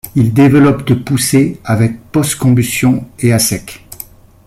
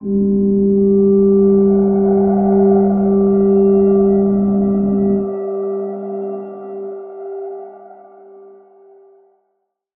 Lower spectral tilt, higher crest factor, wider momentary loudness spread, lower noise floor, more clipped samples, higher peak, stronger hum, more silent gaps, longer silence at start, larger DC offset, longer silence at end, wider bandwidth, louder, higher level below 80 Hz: second, -5.5 dB/octave vs -16 dB/octave; about the same, 10 dB vs 12 dB; first, 20 LU vs 16 LU; second, -35 dBFS vs -70 dBFS; neither; about the same, -2 dBFS vs -2 dBFS; neither; neither; about the same, 0.05 s vs 0 s; neither; second, 0.45 s vs 2.05 s; first, 16 kHz vs 2.1 kHz; about the same, -12 LUFS vs -14 LUFS; about the same, -42 dBFS vs -44 dBFS